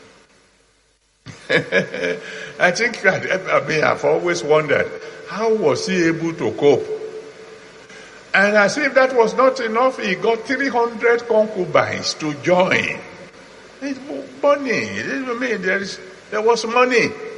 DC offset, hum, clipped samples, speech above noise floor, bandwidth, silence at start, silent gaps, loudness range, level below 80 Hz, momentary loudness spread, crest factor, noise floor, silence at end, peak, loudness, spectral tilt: under 0.1%; none; under 0.1%; 42 dB; 11 kHz; 1.25 s; none; 4 LU; -62 dBFS; 14 LU; 18 dB; -60 dBFS; 0 s; 0 dBFS; -18 LUFS; -4.5 dB/octave